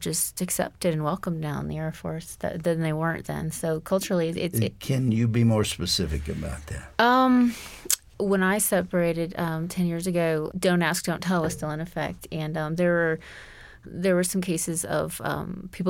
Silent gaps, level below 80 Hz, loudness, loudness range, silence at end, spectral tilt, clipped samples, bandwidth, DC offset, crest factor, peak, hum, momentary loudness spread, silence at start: none; -46 dBFS; -26 LUFS; 5 LU; 0 s; -5 dB/octave; under 0.1%; 17 kHz; under 0.1%; 20 dB; -6 dBFS; none; 11 LU; 0 s